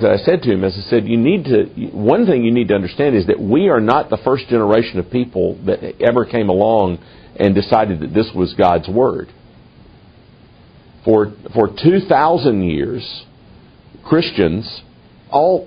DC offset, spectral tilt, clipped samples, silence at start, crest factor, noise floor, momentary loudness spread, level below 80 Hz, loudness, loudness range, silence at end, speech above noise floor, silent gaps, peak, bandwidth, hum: under 0.1%; -9.5 dB/octave; under 0.1%; 0 s; 16 dB; -45 dBFS; 8 LU; -44 dBFS; -15 LUFS; 4 LU; 0 s; 30 dB; none; 0 dBFS; 5.2 kHz; none